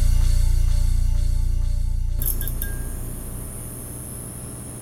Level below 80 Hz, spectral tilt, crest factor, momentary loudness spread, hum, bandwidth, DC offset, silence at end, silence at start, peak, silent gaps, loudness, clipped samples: -22 dBFS; -5 dB/octave; 12 dB; 10 LU; none; 16.5 kHz; under 0.1%; 0 s; 0 s; -8 dBFS; none; -27 LUFS; under 0.1%